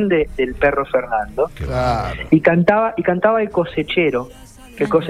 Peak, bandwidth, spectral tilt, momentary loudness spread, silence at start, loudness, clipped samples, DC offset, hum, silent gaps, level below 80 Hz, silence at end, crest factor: 0 dBFS; 13.5 kHz; -7.5 dB/octave; 8 LU; 0 s; -18 LUFS; under 0.1%; under 0.1%; none; none; -36 dBFS; 0 s; 16 dB